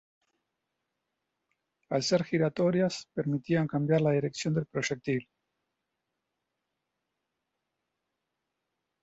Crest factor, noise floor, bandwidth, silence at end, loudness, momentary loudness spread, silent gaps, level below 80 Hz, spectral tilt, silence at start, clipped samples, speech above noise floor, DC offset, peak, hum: 18 dB; -84 dBFS; 8.2 kHz; 3.8 s; -29 LUFS; 7 LU; none; -70 dBFS; -6 dB/octave; 1.9 s; under 0.1%; 56 dB; under 0.1%; -14 dBFS; none